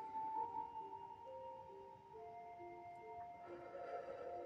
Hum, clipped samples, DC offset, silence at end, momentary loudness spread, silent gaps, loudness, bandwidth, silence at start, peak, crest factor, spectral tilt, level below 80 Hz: none; under 0.1%; under 0.1%; 0 s; 11 LU; none; -51 LUFS; 8 kHz; 0 s; -36 dBFS; 16 dB; -4.5 dB/octave; -82 dBFS